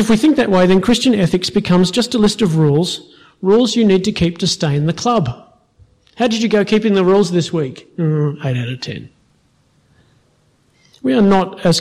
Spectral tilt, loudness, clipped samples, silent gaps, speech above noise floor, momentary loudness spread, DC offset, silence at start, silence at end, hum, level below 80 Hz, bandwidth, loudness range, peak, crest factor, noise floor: -6 dB/octave; -15 LUFS; under 0.1%; none; 43 dB; 10 LU; under 0.1%; 0 s; 0 s; none; -44 dBFS; 14 kHz; 8 LU; -4 dBFS; 12 dB; -57 dBFS